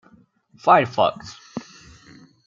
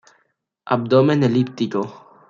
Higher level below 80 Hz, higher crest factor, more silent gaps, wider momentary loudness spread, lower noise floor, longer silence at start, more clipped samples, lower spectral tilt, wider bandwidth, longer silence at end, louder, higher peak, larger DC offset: about the same, -62 dBFS vs -64 dBFS; about the same, 22 dB vs 18 dB; neither; first, 20 LU vs 10 LU; second, -55 dBFS vs -68 dBFS; about the same, 0.65 s vs 0.65 s; neither; second, -5.5 dB/octave vs -8 dB/octave; about the same, 7.6 kHz vs 7.4 kHz; first, 0.85 s vs 0.3 s; about the same, -19 LUFS vs -19 LUFS; about the same, -2 dBFS vs -2 dBFS; neither